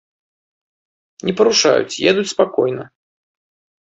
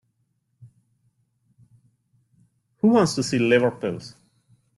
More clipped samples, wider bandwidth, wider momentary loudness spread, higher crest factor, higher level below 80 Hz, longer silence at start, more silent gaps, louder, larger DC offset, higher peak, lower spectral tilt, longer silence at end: neither; second, 8.2 kHz vs 12 kHz; second, 11 LU vs 15 LU; about the same, 18 dB vs 20 dB; about the same, -60 dBFS vs -64 dBFS; first, 1.25 s vs 0.6 s; neither; first, -16 LUFS vs -21 LUFS; neither; about the same, -2 dBFS vs -4 dBFS; second, -3 dB/octave vs -5.5 dB/octave; first, 1.1 s vs 0.65 s